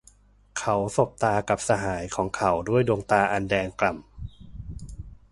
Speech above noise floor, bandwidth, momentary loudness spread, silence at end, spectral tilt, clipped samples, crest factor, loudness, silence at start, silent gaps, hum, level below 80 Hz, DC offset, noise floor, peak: 32 dB; 11.5 kHz; 19 LU; 0.2 s; -5.5 dB/octave; under 0.1%; 20 dB; -25 LUFS; 0.55 s; none; none; -46 dBFS; under 0.1%; -56 dBFS; -6 dBFS